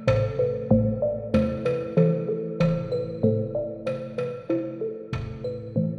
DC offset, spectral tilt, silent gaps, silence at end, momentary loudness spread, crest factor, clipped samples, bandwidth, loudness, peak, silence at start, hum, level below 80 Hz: under 0.1%; -9 dB/octave; none; 0 s; 9 LU; 18 dB; under 0.1%; 6.8 kHz; -26 LUFS; -6 dBFS; 0 s; none; -46 dBFS